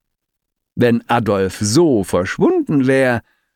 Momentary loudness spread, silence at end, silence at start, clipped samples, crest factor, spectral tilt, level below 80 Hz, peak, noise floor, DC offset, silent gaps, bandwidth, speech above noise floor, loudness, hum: 5 LU; 0.35 s; 0.75 s; under 0.1%; 14 dB; -5.5 dB/octave; -52 dBFS; -2 dBFS; -77 dBFS; under 0.1%; none; 16.5 kHz; 62 dB; -16 LUFS; none